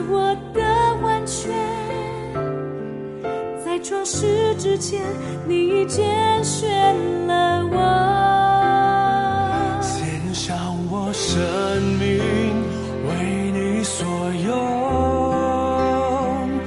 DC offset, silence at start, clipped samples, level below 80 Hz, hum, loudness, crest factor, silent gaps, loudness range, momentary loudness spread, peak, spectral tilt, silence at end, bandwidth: under 0.1%; 0 s; under 0.1%; -38 dBFS; none; -21 LUFS; 14 dB; none; 6 LU; 9 LU; -6 dBFS; -5 dB/octave; 0 s; 11.5 kHz